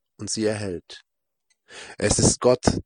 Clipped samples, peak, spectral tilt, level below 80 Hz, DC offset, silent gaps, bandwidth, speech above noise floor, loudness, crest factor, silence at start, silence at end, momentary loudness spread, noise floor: under 0.1%; -2 dBFS; -4 dB/octave; -44 dBFS; under 0.1%; none; 10.5 kHz; 50 dB; -22 LUFS; 22 dB; 0.2 s; 0.05 s; 23 LU; -73 dBFS